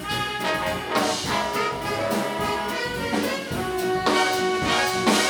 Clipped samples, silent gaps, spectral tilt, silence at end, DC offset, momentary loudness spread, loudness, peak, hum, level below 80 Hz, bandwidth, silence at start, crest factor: under 0.1%; none; -3 dB/octave; 0 s; under 0.1%; 6 LU; -24 LUFS; -6 dBFS; none; -50 dBFS; over 20 kHz; 0 s; 18 dB